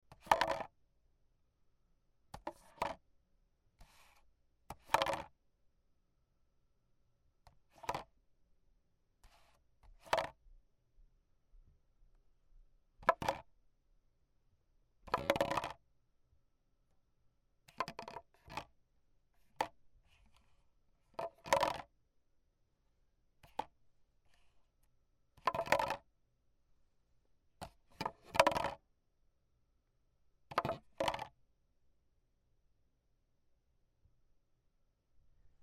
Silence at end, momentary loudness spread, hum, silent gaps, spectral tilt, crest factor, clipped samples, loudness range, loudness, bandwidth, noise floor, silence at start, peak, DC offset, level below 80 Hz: 0.15 s; 20 LU; none; none; -3.5 dB/octave; 36 dB; under 0.1%; 11 LU; -39 LUFS; 16 kHz; -77 dBFS; 0.1 s; -10 dBFS; under 0.1%; -68 dBFS